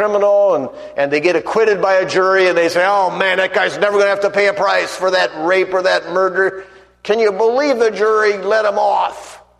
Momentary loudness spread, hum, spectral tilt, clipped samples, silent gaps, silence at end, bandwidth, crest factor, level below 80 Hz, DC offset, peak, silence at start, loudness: 6 LU; none; -4 dB/octave; under 0.1%; none; 0.25 s; 12.5 kHz; 14 dB; -60 dBFS; under 0.1%; 0 dBFS; 0 s; -15 LUFS